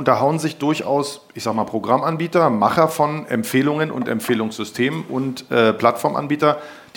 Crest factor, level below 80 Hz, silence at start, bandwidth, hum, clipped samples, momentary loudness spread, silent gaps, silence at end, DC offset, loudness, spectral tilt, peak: 18 dB; -62 dBFS; 0 s; 17.5 kHz; none; under 0.1%; 8 LU; none; 0.15 s; under 0.1%; -19 LUFS; -5.5 dB/octave; 0 dBFS